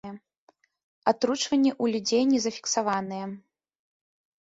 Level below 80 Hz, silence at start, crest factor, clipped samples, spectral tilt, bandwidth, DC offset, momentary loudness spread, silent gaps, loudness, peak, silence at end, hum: -70 dBFS; 0.05 s; 20 dB; under 0.1%; -3.5 dB/octave; 8 kHz; under 0.1%; 14 LU; 0.38-0.47 s, 0.83-1.02 s; -26 LUFS; -8 dBFS; 1 s; none